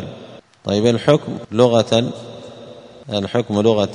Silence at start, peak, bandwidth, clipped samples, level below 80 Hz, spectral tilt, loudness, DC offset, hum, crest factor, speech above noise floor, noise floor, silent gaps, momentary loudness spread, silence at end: 0 s; 0 dBFS; 10.5 kHz; under 0.1%; -56 dBFS; -6 dB/octave; -17 LUFS; under 0.1%; none; 18 dB; 23 dB; -40 dBFS; none; 23 LU; 0 s